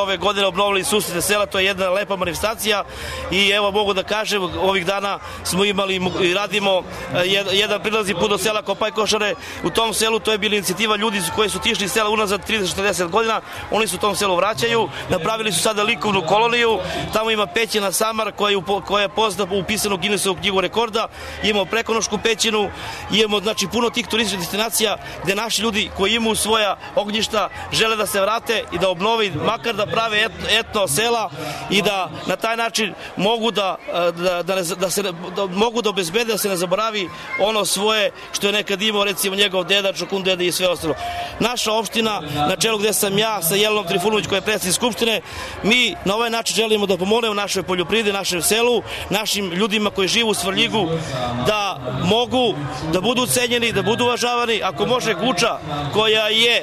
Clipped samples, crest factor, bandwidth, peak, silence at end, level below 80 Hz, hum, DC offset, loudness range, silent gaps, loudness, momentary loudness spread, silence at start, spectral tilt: under 0.1%; 14 dB; 13.5 kHz; -4 dBFS; 0 s; -46 dBFS; none; under 0.1%; 2 LU; none; -19 LUFS; 5 LU; 0 s; -3 dB/octave